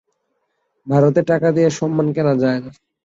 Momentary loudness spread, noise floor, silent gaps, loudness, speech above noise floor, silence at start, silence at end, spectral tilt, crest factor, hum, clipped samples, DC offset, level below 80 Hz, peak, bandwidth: 5 LU; -70 dBFS; none; -17 LUFS; 54 dB; 0.85 s; 0.35 s; -7.5 dB/octave; 16 dB; none; under 0.1%; under 0.1%; -58 dBFS; -2 dBFS; 8 kHz